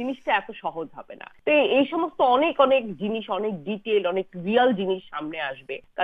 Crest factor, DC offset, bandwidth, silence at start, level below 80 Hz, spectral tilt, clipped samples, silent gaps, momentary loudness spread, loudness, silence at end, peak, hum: 18 dB; under 0.1%; 4.8 kHz; 0 s; -64 dBFS; -7.5 dB/octave; under 0.1%; none; 14 LU; -24 LUFS; 0 s; -6 dBFS; none